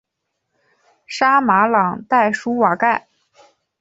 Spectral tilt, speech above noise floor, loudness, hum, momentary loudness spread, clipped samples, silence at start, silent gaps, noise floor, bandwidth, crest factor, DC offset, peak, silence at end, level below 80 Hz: -5.5 dB/octave; 60 dB; -16 LUFS; none; 5 LU; under 0.1%; 1.1 s; none; -76 dBFS; 8 kHz; 16 dB; under 0.1%; -2 dBFS; 0.8 s; -64 dBFS